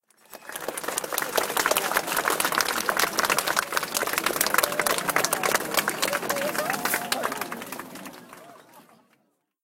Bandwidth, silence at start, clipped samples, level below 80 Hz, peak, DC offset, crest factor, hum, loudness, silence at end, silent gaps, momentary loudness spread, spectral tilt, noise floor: 17 kHz; 0.3 s; under 0.1%; -64 dBFS; 0 dBFS; under 0.1%; 28 dB; none; -25 LUFS; 0.8 s; none; 13 LU; -1 dB/octave; -69 dBFS